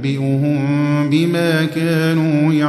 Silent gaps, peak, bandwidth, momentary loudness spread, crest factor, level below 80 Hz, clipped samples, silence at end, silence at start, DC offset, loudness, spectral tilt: none; -4 dBFS; 13.5 kHz; 2 LU; 12 dB; -58 dBFS; under 0.1%; 0 s; 0 s; under 0.1%; -16 LUFS; -7 dB/octave